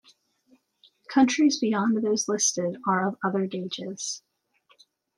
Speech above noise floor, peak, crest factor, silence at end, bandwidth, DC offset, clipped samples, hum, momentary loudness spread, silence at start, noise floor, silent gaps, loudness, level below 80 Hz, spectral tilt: 41 dB; -8 dBFS; 18 dB; 1 s; 12 kHz; under 0.1%; under 0.1%; none; 11 LU; 1.1 s; -65 dBFS; none; -25 LUFS; -72 dBFS; -3.5 dB/octave